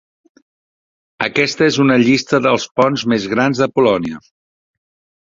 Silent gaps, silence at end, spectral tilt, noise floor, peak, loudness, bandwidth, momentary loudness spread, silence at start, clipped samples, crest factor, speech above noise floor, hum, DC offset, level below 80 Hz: 2.71-2.75 s; 1.05 s; -5 dB/octave; under -90 dBFS; 0 dBFS; -15 LUFS; 7.8 kHz; 7 LU; 1.2 s; under 0.1%; 16 dB; over 76 dB; none; under 0.1%; -54 dBFS